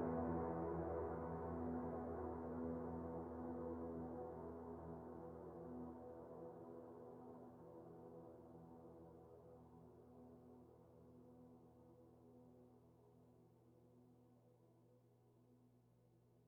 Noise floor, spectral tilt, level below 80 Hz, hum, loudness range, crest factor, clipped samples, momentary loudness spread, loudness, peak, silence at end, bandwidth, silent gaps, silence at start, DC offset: -74 dBFS; -10 dB/octave; -70 dBFS; 60 Hz at -75 dBFS; 19 LU; 20 dB; under 0.1%; 20 LU; -51 LUFS; -32 dBFS; 0 s; 3.6 kHz; none; 0 s; under 0.1%